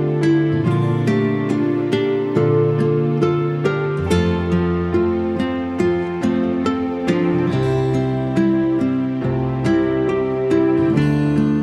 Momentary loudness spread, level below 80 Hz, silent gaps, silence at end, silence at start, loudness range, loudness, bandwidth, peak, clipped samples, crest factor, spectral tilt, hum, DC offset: 4 LU; -44 dBFS; none; 0 s; 0 s; 1 LU; -18 LUFS; 11 kHz; -4 dBFS; under 0.1%; 14 dB; -8 dB/octave; none; under 0.1%